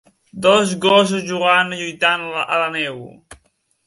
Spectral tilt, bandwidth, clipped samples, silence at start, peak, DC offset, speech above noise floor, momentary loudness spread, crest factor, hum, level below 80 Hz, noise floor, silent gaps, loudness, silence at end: -3.5 dB/octave; 11.5 kHz; under 0.1%; 0.35 s; 0 dBFS; under 0.1%; 44 dB; 8 LU; 18 dB; none; -60 dBFS; -61 dBFS; none; -17 LUFS; 0.5 s